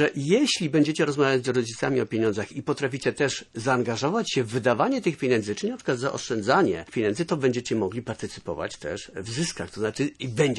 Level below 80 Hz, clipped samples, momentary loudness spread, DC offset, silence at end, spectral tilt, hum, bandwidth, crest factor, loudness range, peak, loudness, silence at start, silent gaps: -60 dBFS; under 0.1%; 10 LU; under 0.1%; 0 s; -5 dB/octave; none; 11.5 kHz; 18 dB; 4 LU; -6 dBFS; -26 LUFS; 0 s; none